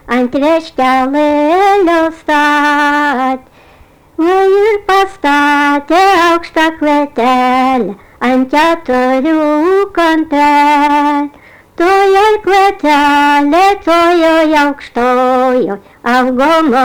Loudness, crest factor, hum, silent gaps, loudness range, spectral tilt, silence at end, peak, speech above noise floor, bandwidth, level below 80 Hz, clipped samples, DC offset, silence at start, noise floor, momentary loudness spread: -10 LUFS; 6 dB; none; none; 2 LU; -4 dB/octave; 0 s; -4 dBFS; 33 dB; over 20 kHz; -42 dBFS; under 0.1%; under 0.1%; 0.05 s; -42 dBFS; 6 LU